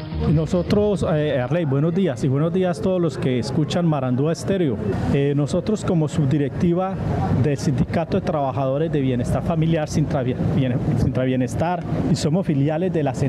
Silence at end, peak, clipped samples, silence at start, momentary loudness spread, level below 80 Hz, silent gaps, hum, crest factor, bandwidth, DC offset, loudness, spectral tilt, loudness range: 0 s; -6 dBFS; under 0.1%; 0 s; 2 LU; -40 dBFS; none; none; 14 dB; 12 kHz; under 0.1%; -21 LUFS; -7.5 dB/octave; 1 LU